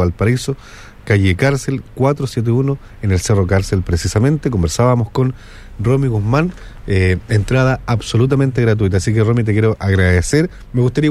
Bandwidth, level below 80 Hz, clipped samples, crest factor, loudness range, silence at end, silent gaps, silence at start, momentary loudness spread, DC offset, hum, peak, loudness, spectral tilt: 13 kHz; -32 dBFS; under 0.1%; 14 dB; 2 LU; 0 s; none; 0 s; 6 LU; under 0.1%; none; -2 dBFS; -16 LUFS; -6.5 dB/octave